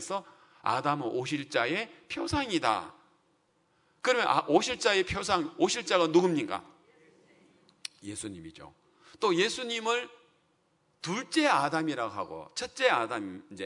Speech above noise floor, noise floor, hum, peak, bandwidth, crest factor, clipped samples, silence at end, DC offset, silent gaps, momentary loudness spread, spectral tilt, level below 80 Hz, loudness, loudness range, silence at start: 42 dB; -71 dBFS; none; -8 dBFS; 11 kHz; 22 dB; under 0.1%; 0 s; under 0.1%; none; 14 LU; -3.5 dB/octave; -62 dBFS; -29 LUFS; 6 LU; 0 s